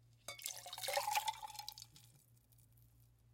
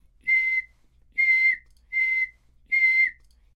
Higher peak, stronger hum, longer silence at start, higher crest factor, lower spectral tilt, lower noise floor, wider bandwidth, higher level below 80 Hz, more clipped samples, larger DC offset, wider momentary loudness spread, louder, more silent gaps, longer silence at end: second, -22 dBFS vs -12 dBFS; neither; second, 0.05 s vs 0.25 s; first, 26 dB vs 12 dB; about the same, 0 dB/octave vs 0 dB/octave; first, -69 dBFS vs -58 dBFS; first, 17 kHz vs 11 kHz; second, -76 dBFS vs -60 dBFS; neither; neither; first, 18 LU vs 11 LU; second, -43 LUFS vs -22 LUFS; neither; second, 0.25 s vs 0.45 s